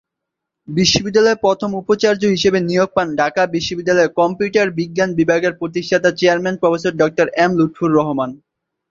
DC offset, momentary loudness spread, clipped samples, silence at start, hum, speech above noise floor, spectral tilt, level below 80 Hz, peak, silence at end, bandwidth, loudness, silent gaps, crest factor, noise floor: under 0.1%; 5 LU; under 0.1%; 0.7 s; none; 65 dB; -5 dB/octave; -50 dBFS; 0 dBFS; 0.55 s; 7.6 kHz; -16 LUFS; none; 16 dB; -80 dBFS